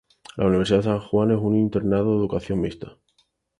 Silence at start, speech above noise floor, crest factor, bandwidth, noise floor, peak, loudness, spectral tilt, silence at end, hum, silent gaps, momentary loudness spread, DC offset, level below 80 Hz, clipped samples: 0.35 s; 46 dB; 16 dB; 10.5 kHz; -67 dBFS; -6 dBFS; -22 LUFS; -8 dB/octave; 0.7 s; none; none; 12 LU; under 0.1%; -46 dBFS; under 0.1%